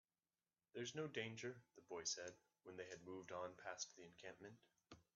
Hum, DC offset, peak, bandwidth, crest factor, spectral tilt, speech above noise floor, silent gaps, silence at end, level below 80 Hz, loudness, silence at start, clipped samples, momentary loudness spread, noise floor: none; under 0.1%; -32 dBFS; 7.4 kHz; 24 dB; -3 dB/octave; over 37 dB; none; 0.15 s; -90 dBFS; -52 LUFS; 0.75 s; under 0.1%; 16 LU; under -90 dBFS